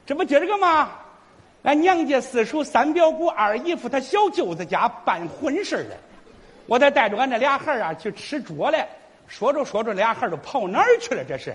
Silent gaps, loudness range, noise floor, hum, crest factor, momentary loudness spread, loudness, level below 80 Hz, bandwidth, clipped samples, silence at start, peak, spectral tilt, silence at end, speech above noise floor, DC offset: none; 3 LU; -52 dBFS; none; 18 dB; 9 LU; -21 LUFS; -62 dBFS; 11 kHz; under 0.1%; 0.05 s; -4 dBFS; -4.5 dB/octave; 0 s; 31 dB; under 0.1%